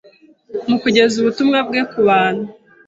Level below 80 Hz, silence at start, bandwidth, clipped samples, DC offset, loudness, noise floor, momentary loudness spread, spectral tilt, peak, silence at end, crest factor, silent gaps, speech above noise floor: -58 dBFS; 0.5 s; 8 kHz; under 0.1%; under 0.1%; -16 LUFS; -47 dBFS; 13 LU; -5 dB/octave; -2 dBFS; 0.35 s; 16 dB; none; 32 dB